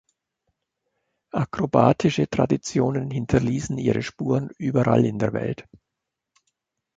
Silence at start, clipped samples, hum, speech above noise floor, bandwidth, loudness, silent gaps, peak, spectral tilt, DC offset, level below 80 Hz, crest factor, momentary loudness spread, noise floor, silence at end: 1.35 s; under 0.1%; none; 61 dB; 8 kHz; -23 LUFS; none; -2 dBFS; -7 dB/octave; under 0.1%; -50 dBFS; 22 dB; 9 LU; -83 dBFS; 1.2 s